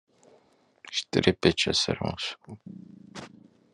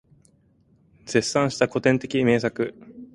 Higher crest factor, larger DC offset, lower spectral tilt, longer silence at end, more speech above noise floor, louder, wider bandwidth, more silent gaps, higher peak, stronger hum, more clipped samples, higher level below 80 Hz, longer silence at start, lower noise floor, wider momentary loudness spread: first, 26 dB vs 20 dB; neither; about the same, -4 dB/octave vs -5 dB/octave; first, 0.45 s vs 0.1 s; about the same, 36 dB vs 38 dB; second, -26 LUFS vs -23 LUFS; about the same, 11 kHz vs 11.5 kHz; neither; about the same, -4 dBFS vs -4 dBFS; neither; neither; about the same, -60 dBFS vs -58 dBFS; second, 0.85 s vs 1.05 s; about the same, -63 dBFS vs -60 dBFS; first, 23 LU vs 9 LU